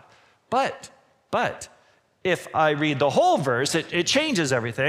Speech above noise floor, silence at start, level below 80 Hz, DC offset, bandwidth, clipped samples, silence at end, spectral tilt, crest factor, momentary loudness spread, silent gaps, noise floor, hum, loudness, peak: 34 dB; 0.5 s; -64 dBFS; under 0.1%; 16 kHz; under 0.1%; 0 s; -4 dB/octave; 18 dB; 9 LU; none; -57 dBFS; none; -23 LUFS; -6 dBFS